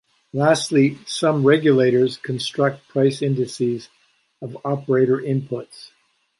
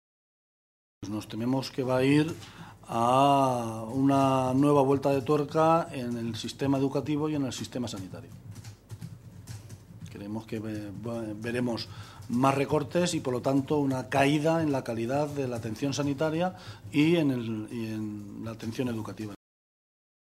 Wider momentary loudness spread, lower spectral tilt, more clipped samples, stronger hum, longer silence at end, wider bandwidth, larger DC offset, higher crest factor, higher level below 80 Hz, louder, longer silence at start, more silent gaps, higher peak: second, 15 LU vs 21 LU; about the same, -6 dB/octave vs -6.5 dB/octave; neither; neither; second, 0.5 s vs 1 s; second, 11.5 kHz vs 15 kHz; neither; about the same, 18 dB vs 22 dB; about the same, -66 dBFS vs -62 dBFS; first, -20 LUFS vs -28 LUFS; second, 0.35 s vs 1 s; neither; first, -2 dBFS vs -8 dBFS